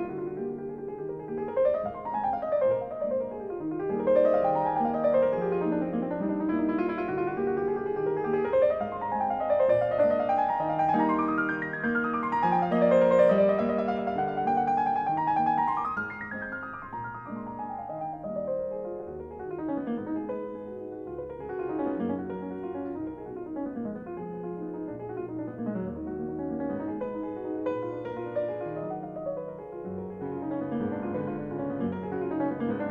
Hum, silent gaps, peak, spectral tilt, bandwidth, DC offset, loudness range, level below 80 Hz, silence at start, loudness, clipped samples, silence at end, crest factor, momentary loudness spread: none; none; -10 dBFS; -9 dB/octave; 7.4 kHz; under 0.1%; 10 LU; -60 dBFS; 0 s; -29 LUFS; under 0.1%; 0 s; 18 dB; 13 LU